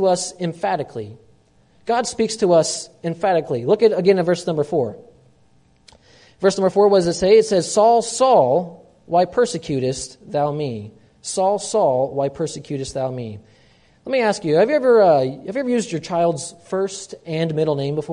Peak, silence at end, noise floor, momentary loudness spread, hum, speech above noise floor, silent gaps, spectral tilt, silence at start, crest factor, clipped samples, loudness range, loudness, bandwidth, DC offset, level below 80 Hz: -2 dBFS; 0 s; -56 dBFS; 13 LU; none; 38 dB; none; -5 dB/octave; 0 s; 16 dB; under 0.1%; 6 LU; -19 LUFS; 11 kHz; under 0.1%; -56 dBFS